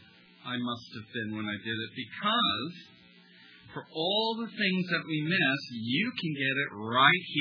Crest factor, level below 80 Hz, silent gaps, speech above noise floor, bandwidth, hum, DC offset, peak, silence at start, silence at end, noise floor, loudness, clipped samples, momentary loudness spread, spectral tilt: 26 dB; -78 dBFS; none; 26 dB; 5.4 kHz; none; under 0.1%; -6 dBFS; 0.45 s; 0 s; -56 dBFS; -29 LUFS; under 0.1%; 16 LU; -6 dB/octave